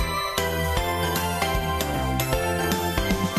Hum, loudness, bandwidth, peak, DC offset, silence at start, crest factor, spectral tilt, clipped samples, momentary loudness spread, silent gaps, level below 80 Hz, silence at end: none; -25 LUFS; 15.5 kHz; -6 dBFS; under 0.1%; 0 s; 18 dB; -4.5 dB/octave; under 0.1%; 1 LU; none; -34 dBFS; 0 s